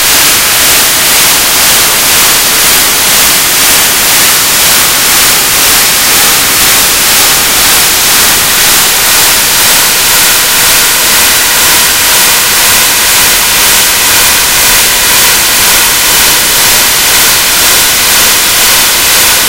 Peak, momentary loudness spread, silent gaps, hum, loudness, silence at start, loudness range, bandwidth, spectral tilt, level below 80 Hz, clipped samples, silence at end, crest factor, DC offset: 0 dBFS; 1 LU; none; none; -3 LUFS; 0 s; 0 LU; over 20 kHz; 0.5 dB/octave; -30 dBFS; 6%; 0 s; 6 dB; 2%